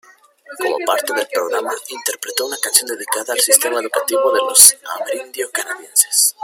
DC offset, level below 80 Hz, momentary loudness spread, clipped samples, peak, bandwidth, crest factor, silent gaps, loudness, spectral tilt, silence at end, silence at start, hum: under 0.1%; -68 dBFS; 16 LU; 0.3%; 0 dBFS; over 20 kHz; 18 dB; none; -15 LUFS; 2 dB/octave; 0 s; 0.5 s; none